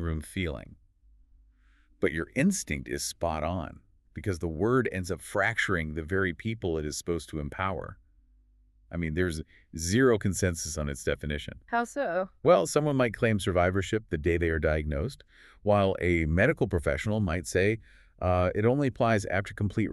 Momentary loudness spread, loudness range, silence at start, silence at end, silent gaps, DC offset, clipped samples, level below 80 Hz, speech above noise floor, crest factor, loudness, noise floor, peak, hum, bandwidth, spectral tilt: 10 LU; 6 LU; 0 s; 0 s; none; under 0.1%; under 0.1%; -44 dBFS; 34 dB; 20 dB; -29 LUFS; -62 dBFS; -10 dBFS; none; 13.5 kHz; -5.5 dB/octave